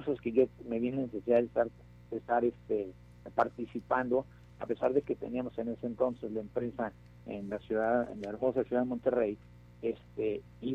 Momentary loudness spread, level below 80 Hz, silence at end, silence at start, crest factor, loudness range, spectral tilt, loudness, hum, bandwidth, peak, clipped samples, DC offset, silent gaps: 11 LU; -60 dBFS; 0 s; 0 s; 18 dB; 3 LU; -8.5 dB/octave; -34 LUFS; 60 Hz at -55 dBFS; 7.2 kHz; -14 dBFS; under 0.1%; under 0.1%; none